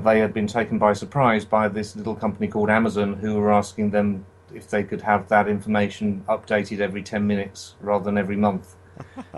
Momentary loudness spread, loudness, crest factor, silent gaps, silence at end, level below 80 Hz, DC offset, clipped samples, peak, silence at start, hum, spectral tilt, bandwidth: 10 LU; -22 LUFS; 18 dB; none; 0 s; -56 dBFS; under 0.1%; under 0.1%; -4 dBFS; 0 s; none; -6.5 dB/octave; 11.5 kHz